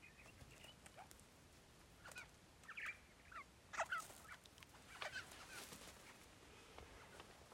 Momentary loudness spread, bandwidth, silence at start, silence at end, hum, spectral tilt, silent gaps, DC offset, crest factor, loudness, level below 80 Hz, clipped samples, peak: 14 LU; 16 kHz; 0 s; 0 s; none; -2 dB/octave; none; under 0.1%; 24 dB; -54 LUFS; -74 dBFS; under 0.1%; -32 dBFS